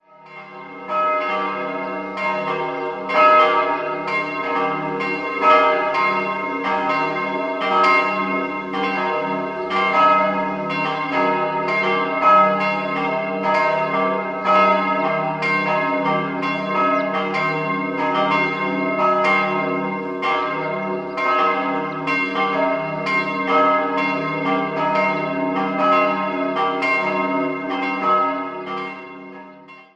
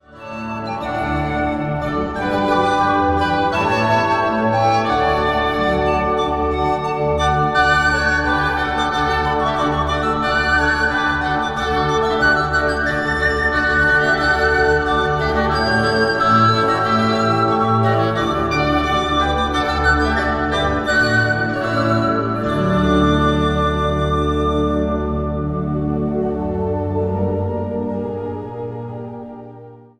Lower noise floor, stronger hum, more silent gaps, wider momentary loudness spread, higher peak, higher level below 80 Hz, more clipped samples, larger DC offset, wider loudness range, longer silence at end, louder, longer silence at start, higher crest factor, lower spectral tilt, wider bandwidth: about the same, -42 dBFS vs -39 dBFS; neither; neither; about the same, 9 LU vs 7 LU; about the same, -2 dBFS vs -2 dBFS; second, -62 dBFS vs -30 dBFS; neither; neither; about the same, 3 LU vs 4 LU; about the same, 0.15 s vs 0.2 s; about the same, -19 LUFS vs -17 LUFS; about the same, 0.2 s vs 0.1 s; about the same, 18 dB vs 14 dB; about the same, -6 dB/octave vs -6 dB/octave; second, 8.4 kHz vs 12.5 kHz